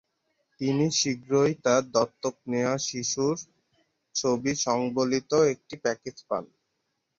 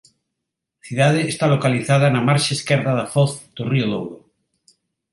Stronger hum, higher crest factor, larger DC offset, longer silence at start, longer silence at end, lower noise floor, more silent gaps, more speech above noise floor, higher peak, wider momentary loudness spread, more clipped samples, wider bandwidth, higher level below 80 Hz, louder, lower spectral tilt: neither; about the same, 18 dB vs 18 dB; neither; second, 0.6 s vs 0.85 s; second, 0.75 s vs 0.95 s; about the same, -78 dBFS vs -81 dBFS; neither; second, 52 dB vs 62 dB; second, -10 dBFS vs -2 dBFS; about the same, 10 LU vs 10 LU; neither; second, 7.8 kHz vs 11.5 kHz; second, -66 dBFS vs -60 dBFS; second, -27 LUFS vs -19 LUFS; second, -4 dB/octave vs -5.5 dB/octave